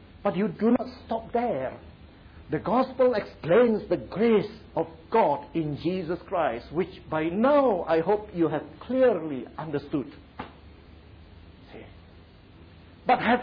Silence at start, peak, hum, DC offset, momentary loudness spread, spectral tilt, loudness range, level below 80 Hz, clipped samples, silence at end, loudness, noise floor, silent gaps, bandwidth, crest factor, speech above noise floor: 0.15 s; -10 dBFS; none; under 0.1%; 13 LU; -9.5 dB/octave; 10 LU; -54 dBFS; under 0.1%; 0 s; -26 LUFS; -51 dBFS; none; 5.2 kHz; 16 dB; 26 dB